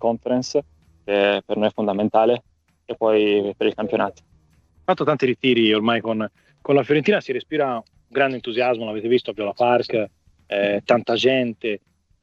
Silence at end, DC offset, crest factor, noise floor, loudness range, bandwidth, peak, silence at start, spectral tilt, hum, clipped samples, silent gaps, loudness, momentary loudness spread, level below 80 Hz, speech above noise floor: 0.45 s; under 0.1%; 18 dB; -57 dBFS; 2 LU; 7.6 kHz; -2 dBFS; 0 s; -5.5 dB/octave; none; under 0.1%; none; -21 LUFS; 10 LU; -62 dBFS; 37 dB